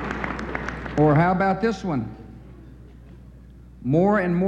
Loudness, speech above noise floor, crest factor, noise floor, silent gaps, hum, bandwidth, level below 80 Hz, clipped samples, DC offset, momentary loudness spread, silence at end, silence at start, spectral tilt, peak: -22 LUFS; 25 dB; 16 dB; -45 dBFS; none; none; 8.2 kHz; -42 dBFS; under 0.1%; under 0.1%; 18 LU; 0 s; 0 s; -8.5 dB/octave; -8 dBFS